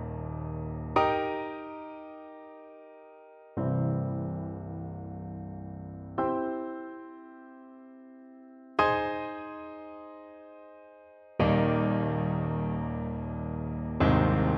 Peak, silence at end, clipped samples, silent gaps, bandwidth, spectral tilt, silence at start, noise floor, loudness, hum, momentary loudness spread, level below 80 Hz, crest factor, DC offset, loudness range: -10 dBFS; 0 s; under 0.1%; none; 6.2 kHz; -9.5 dB/octave; 0 s; -54 dBFS; -31 LUFS; none; 24 LU; -46 dBFS; 20 dB; under 0.1%; 7 LU